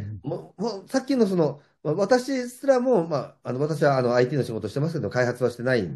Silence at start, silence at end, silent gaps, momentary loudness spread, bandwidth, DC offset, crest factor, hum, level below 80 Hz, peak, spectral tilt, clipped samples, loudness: 0 s; 0 s; none; 10 LU; 12.5 kHz; under 0.1%; 16 dB; none; -66 dBFS; -8 dBFS; -6.5 dB/octave; under 0.1%; -24 LUFS